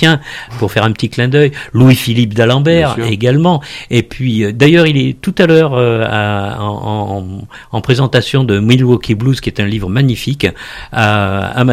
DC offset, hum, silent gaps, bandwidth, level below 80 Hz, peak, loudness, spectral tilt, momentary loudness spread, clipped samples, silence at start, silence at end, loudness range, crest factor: under 0.1%; none; none; 15 kHz; -38 dBFS; 0 dBFS; -12 LUFS; -6.5 dB/octave; 10 LU; 0.5%; 0 s; 0 s; 3 LU; 12 dB